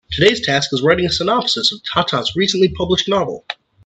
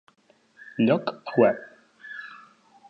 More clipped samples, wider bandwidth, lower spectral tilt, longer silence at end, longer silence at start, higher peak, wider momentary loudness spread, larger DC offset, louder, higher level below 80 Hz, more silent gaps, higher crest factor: neither; first, 9 kHz vs 5.8 kHz; second, -4 dB/octave vs -8.5 dB/octave; second, 0.3 s vs 0.55 s; second, 0.1 s vs 0.8 s; first, 0 dBFS vs -6 dBFS; second, 5 LU vs 20 LU; neither; first, -16 LUFS vs -24 LUFS; first, -44 dBFS vs -74 dBFS; neither; second, 16 dB vs 22 dB